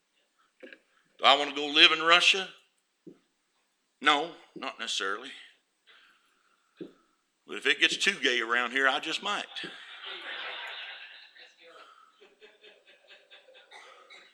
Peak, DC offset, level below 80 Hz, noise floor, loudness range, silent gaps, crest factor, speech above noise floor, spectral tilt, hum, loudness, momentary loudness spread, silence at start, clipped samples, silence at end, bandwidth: -4 dBFS; under 0.1%; -90 dBFS; -75 dBFS; 18 LU; none; 28 dB; 48 dB; -0.5 dB/octave; none; -25 LUFS; 24 LU; 0.65 s; under 0.1%; 0.15 s; 19.5 kHz